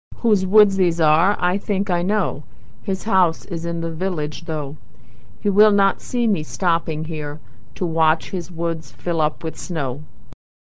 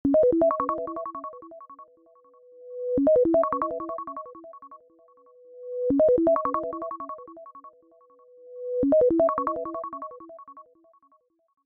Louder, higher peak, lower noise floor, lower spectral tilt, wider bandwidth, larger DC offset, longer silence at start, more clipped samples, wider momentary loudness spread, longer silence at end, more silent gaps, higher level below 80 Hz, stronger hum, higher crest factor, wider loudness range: first, -21 LUFS vs -25 LUFS; first, -2 dBFS vs -10 dBFS; second, -42 dBFS vs -65 dBFS; second, -6.5 dB/octave vs -11.5 dB/octave; first, 8 kHz vs 2.8 kHz; first, 7% vs under 0.1%; about the same, 0.1 s vs 0.05 s; neither; second, 12 LU vs 25 LU; second, 0.25 s vs 1.05 s; neither; first, -46 dBFS vs -56 dBFS; neither; about the same, 18 dB vs 16 dB; first, 4 LU vs 1 LU